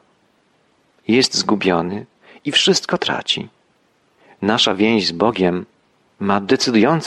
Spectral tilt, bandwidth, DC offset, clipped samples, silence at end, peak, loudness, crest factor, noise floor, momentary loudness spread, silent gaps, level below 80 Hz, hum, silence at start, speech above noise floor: -4 dB/octave; 12 kHz; under 0.1%; under 0.1%; 0 s; -2 dBFS; -17 LUFS; 18 dB; -60 dBFS; 12 LU; none; -58 dBFS; none; 1.1 s; 43 dB